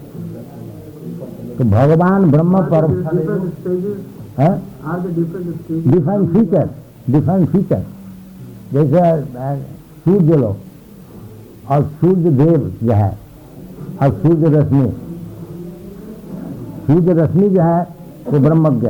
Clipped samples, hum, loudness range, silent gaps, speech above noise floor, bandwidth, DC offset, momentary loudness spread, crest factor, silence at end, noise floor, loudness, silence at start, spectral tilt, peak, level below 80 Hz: under 0.1%; none; 3 LU; none; 24 dB; 19 kHz; under 0.1%; 20 LU; 12 dB; 0 s; -37 dBFS; -15 LUFS; 0 s; -10.5 dB/octave; -4 dBFS; -44 dBFS